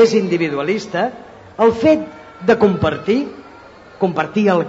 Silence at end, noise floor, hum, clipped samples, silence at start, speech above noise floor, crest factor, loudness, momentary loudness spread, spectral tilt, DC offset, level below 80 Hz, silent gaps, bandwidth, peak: 0 s; -40 dBFS; none; under 0.1%; 0 s; 25 dB; 14 dB; -17 LUFS; 16 LU; -6.5 dB/octave; under 0.1%; -52 dBFS; none; 8 kHz; -2 dBFS